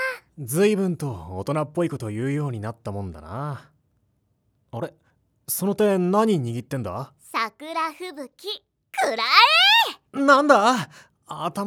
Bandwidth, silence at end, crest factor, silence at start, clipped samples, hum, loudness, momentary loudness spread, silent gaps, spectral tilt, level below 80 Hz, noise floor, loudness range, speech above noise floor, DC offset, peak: over 20 kHz; 0 s; 24 dB; 0 s; under 0.1%; none; -21 LUFS; 20 LU; none; -4 dB/octave; -60 dBFS; -69 dBFS; 14 LU; 46 dB; under 0.1%; 0 dBFS